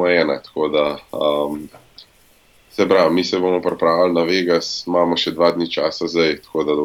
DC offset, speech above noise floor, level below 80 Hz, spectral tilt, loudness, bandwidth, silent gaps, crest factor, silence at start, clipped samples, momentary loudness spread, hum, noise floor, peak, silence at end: under 0.1%; 35 dB; -56 dBFS; -5 dB/octave; -18 LUFS; 15.5 kHz; none; 16 dB; 0 s; under 0.1%; 7 LU; none; -53 dBFS; -2 dBFS; 0 s